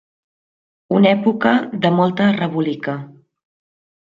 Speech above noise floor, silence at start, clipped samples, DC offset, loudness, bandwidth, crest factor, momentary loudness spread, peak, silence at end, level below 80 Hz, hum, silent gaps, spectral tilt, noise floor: over 74 dB; 0.9 s; under 0.1%; under 0.1%; -17 LUFS; 7 kHz; 16 dB; 10 LU; -2 dBFS; 1 s; -64 dBFS; none; none; -8.5 dB/octave; under -90 dBFS